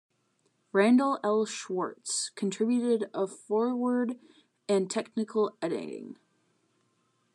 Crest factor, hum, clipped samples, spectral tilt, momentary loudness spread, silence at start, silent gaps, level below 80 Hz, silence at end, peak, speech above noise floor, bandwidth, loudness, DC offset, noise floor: 20 dB; none; under 0.1%; -4.5 dB/octave; 11 LU; 0.75 s; none; under -90 dBFS; 1.2 s; -10 dBFS; 45 dB; 11 kHz; -29 LUFS; under 0.1%; -73 dBFS